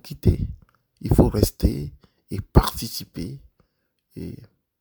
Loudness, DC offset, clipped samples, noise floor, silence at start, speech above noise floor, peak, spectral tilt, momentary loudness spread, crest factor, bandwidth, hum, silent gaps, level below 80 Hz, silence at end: -23 LUFS; under 0.1%; under 0.1%; -72 dBFS; 0.05 s; 50 dB; 0 dBFS; -6.5 dB/octave; 19 LU; 24 dB; over 20 kHz; none; none; -30 dBFS; 0.35 s